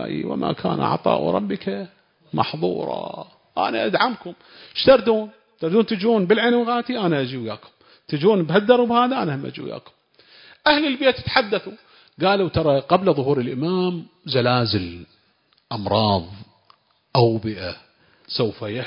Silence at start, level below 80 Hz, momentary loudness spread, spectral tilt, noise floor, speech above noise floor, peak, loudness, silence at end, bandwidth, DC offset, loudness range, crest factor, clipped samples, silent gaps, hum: 0 s; -50 dBFS; 16 LU; -10.5 dB/octave; -63 dBFS; 42 dB; 0 dBFS; -21 LUFS; 0 s; 5.4 kHz; under 0.1%; 5 LU; 20 dB; under 0.1%; none; none